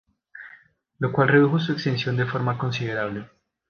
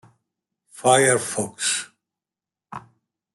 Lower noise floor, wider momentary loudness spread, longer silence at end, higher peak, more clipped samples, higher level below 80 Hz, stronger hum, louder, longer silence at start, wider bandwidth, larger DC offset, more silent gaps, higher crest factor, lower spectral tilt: second, -53 dBFS vs -90 dBFS; second, 20 LU vs 24 LU; about the same, 0.45 s vs 0.55 s; about the same, -4 dBFS vs -2 dBFS; neither; first, -60 dBFS vs -70 dBFS; neither; second, -23 LUFS vs -20 LUFS; second, 0.35 s vs 0.75 s; second, 6.8 kHz vs 12 kHz; neither; neither; about the same, 20 dB vs 22 dB; first, -7.5 dB/octave vs -2.5 dB/octave